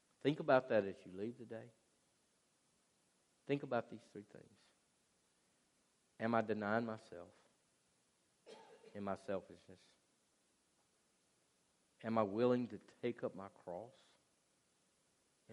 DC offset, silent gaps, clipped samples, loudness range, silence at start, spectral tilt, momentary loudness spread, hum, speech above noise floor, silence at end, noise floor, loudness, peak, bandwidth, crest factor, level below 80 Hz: under 0.1%; none; under 0.1%; 9 LU; 0.25 s; -7 dB/octave; 23 LU; none; 38 dB; 0 s; -79 dBFS; -41 LUFS; -18 dBFS; 11.5 kHz; 26 dB; -88 dBFS